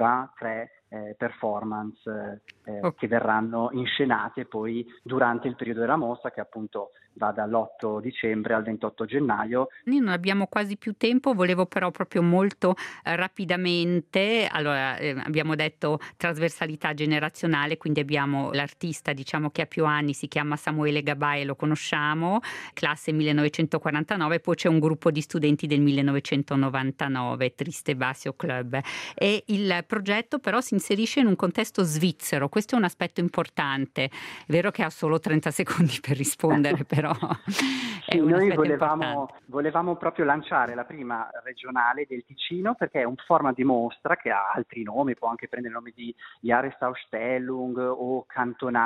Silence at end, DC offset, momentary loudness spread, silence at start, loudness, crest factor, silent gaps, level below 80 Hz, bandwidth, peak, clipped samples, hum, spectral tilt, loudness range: 0 s; under 0.1%; 10 LU; 0 s; -26 LUFS; 24 dB; none; -68 dBFS; 15 kHz; -2 dBFS; under 0.1%; none; -5.5 dB/octave; 4 LU